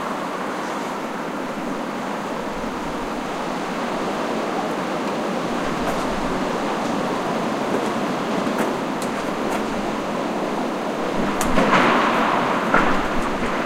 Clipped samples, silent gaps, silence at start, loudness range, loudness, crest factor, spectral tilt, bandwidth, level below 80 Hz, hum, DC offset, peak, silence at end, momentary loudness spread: under 0.1%; none; 0 s; 7 LU; -23 LUFS; 20 dB; -4.5 dB/octave; 16 kHz; -40 dBFS; none; under 0.1%; -2 dBFS; 0 s; 8 LU